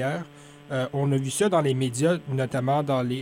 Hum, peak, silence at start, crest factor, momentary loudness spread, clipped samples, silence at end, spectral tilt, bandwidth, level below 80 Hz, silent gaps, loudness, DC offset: none; -10 dBFS; 0 s; 14 dB; 8 LU; under 0.1%; 0 s; -6 dB/octave; 16 kHz; -62 dBFS; none; -25 LUFS; under 0.1%